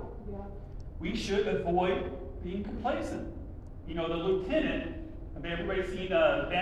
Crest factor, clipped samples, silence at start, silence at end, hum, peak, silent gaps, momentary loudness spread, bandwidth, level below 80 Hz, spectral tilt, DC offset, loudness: 18 dB; under 0.1%; 0 s; 0 s; none; -14 dBFS; none; 17 LU; 11.5 kHz; -44 dBFS; -6 dB/octave; under 0.1%; -32 LUFS